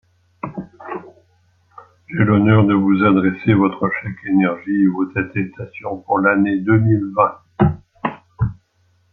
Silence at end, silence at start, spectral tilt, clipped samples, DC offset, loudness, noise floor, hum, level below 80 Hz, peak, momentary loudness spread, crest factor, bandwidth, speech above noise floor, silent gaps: 0.6 s; 0.45 s; -11 dB/octave; under 0.1%; under 0.1%; -17 LUFS; -60 dBFS; none; -46 dBFS; -2 dBFS; 16 LU; 16 dB; 4.2 kHz; 44 dB; none